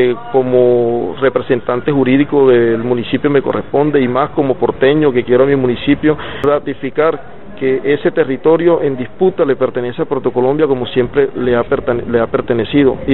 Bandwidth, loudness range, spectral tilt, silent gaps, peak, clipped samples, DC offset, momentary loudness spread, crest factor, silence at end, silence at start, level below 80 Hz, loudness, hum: 4.2 kHz; 2 LU; -5.5 dB/octave; none; 0 dBFS; under 0.1%; 3%; 5 LU; 14 dB; 0 s; 0 s; -42 dBFS; -13 LUFS; none